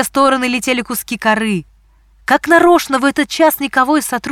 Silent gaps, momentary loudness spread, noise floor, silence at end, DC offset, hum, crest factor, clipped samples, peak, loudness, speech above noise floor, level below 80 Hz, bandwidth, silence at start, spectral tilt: none; 9 LU; -49 dBFS; 0 s; under 0.1%; none; 14 dB; under 0.1%; 0 dBFS; -14 LUFS; 36 dB; -48 dBFS; 18 kHz; 0 s; -3.5 dB/octave